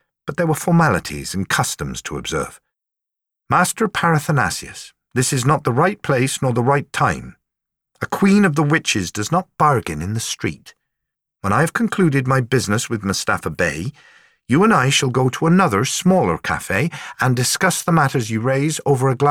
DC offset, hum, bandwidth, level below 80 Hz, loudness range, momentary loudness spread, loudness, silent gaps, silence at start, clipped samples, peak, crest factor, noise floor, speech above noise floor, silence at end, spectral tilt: under 0.1%; none; 17 kHz; -48 dBFS; 4 LU; 10 LU; -18 LUFS; none; 0.25 s; under 0.1%; -4 dBFS; 16 dB; -84 dBFS; 66 dB; 0 s; -5 dB/octave